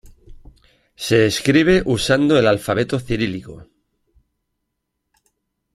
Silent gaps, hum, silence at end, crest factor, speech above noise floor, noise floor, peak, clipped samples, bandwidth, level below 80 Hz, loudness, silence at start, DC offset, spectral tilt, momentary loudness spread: none; none; 2.1 s; 18 dB; 59 dB; -76 dBFS; -2 dBFS; under 0.1%; 15.5 kHz; -42 dBFS; -17 LUFS; 0.3 s; under 0.1%; -5.5 dB/octave; 9 LU